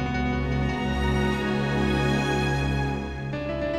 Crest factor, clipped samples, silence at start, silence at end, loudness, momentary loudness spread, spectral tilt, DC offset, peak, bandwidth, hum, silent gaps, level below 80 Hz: 14 dB; under 0.1%; 0 s; 0 s; -26 LUFS; 6 LU; -6.5 dB/octave; under 0.1%; -12 dBFS; 12 kHz; none; none; -34 dBFS